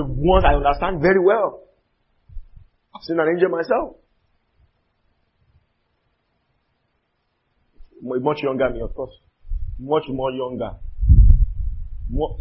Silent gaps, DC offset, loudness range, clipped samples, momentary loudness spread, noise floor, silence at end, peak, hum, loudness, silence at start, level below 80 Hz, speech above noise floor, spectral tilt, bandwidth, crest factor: none; under 0.1%; 9 LU; under 0.1%; 18 LU; -70 dBFS; 0 s; 0 dBFS; none; -20 LUFS; 0 s; -24 dBFS; 51 dB; -12 dB/octave; 5.8 kHz; 20 dB